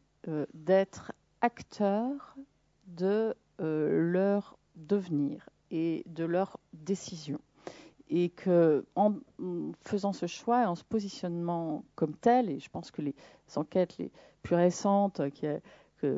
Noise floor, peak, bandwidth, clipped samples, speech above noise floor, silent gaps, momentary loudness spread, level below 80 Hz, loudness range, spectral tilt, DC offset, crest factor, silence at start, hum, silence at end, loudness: -56 dBFS; -12 dBFS; 7.8 kHz; under 0.1%; 26 dB; none; 14 LU; -72 dBFS; 3 LU; -7 dB/octave; under 0.1%; 20 dB; 0.25 s; none; 0 s; -31 LUFS